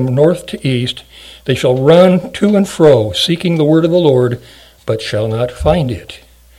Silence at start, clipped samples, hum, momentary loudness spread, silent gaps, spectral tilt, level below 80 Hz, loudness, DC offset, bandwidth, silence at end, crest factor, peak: 0 s; 0.5%; none; 13 LU; none; -6.5 dB/octave; -36 dBFS; -12 LUFS; under 0.1%; 15.5 kHz; 0.45 s; 12 dB; 0 dBFS